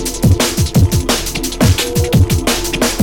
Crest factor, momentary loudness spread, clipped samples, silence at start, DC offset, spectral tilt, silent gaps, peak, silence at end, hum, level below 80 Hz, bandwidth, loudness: 14 dB; 3 LU; under 0.1%; 0 s; under 0.1%; -4.5 dB/octave; none; 0 dBFS; 0 s; none; -22 dBFS; 19 kHz; -14 LUFS